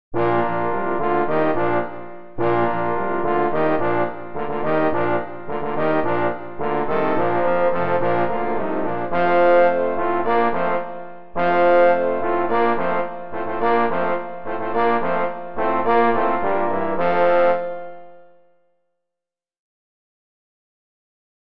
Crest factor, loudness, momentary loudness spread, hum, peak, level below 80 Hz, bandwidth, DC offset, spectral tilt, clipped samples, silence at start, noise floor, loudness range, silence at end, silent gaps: 16 dB; -20 LUFS; 11 LU; none; -4 dBFS; -50 dBFS; 5.6 kHz; 5%; -9.5 dB/octave; under 0.1%; 0.1 s; -87 dBFS; 3 LU; 1.85 s; none